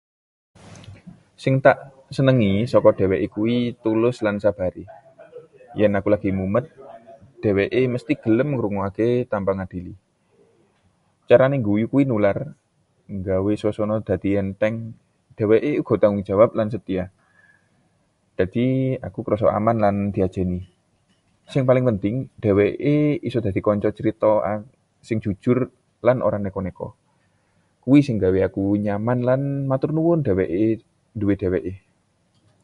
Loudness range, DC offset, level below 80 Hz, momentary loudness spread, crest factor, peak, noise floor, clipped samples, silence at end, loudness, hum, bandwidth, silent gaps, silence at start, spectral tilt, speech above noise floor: 4 LU; under 0.1%; -46 dBFS; 11 LU; 20 dB; 0 dBFS; -65 dBFS; under 0.1%; 0.85 s; -21 LUFS; none; 11 kHz; none; 0.7 s; -9 dB/octave; 45 dB